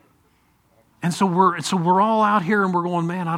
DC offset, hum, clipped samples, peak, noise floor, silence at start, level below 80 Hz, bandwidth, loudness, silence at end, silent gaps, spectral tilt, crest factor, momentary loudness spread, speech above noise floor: under 0.1%; none; under 0.1%; -4 dBFS; -61 dBFS; 1 s; -66 dBFS; 14 kHz; -19 LUFS; 0 s; none; -6 dB/octave; 18 dB; 6 LU; 42 dB